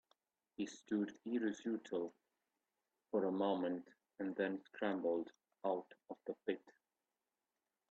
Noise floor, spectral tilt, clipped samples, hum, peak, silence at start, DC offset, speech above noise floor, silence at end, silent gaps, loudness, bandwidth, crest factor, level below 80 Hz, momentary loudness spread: under -90 dBFS; -5 dB/octave; under 0.1%; none; -24 dBFS; 0.6 s; under 0.1%; over 49 dB; 1.2 s; none; -42 LUFS; 7.6 kHz; 20 dB; -88 dBFS; 11 LU